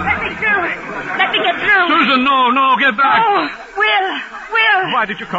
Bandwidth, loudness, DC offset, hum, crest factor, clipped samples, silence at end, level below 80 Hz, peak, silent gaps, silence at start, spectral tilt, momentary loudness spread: 8 kHz; -13 LUFS; under 0.1%; none; 14 dB; under 0.1%; 0 s; -48 dBFS; -2 dBFS; none; 0 s; -4.5 dB/octave; 9 LU